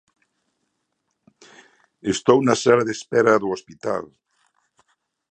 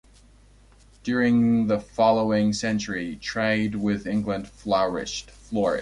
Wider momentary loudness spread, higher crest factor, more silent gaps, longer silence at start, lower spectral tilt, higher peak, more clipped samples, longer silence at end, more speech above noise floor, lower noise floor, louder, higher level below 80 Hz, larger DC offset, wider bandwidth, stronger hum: about the same, 12 LU vs 10 LU; first, 22 dB vs 16 dB; neither; first, 2.05 s vs 1.05 s; about the same, -5 dB/octave vs -5.5 dB/octave; first, 0 dBFS vs -8 dBFS; neither; first, 1.25 s vs 0 s; first, 56 dB vs 30 dB; first, -75 dBFS vs -53 dBFS; first, -20 LUFS vs -24 LUFS; second, -62 dBFS vs -50 dBFS; neither; second, 9.4 kHz vs 11 kHz; neither